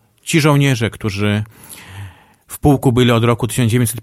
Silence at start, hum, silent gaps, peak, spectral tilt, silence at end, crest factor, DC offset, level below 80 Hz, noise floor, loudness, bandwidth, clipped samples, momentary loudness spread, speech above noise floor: 0.25 s; none; none; 0 dBFS; -5.5 dB/octave; 0 s; 16 dB; under 0.1%; -40 dBFS; -38 dBFS; -15 LUFS; 16 kHz; under 0.1%; 21 LU; 23 dB